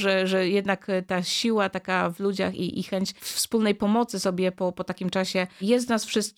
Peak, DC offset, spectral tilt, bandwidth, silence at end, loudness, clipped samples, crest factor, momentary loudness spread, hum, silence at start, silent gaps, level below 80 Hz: -10 dBFS; under 0.1%; -4.5 dB/octave; 17.5 kHz; 0.05 s; -25 LUFS; under 0.1%; 16 dB; 6 LU; none; 0 s; none; -64 dBFS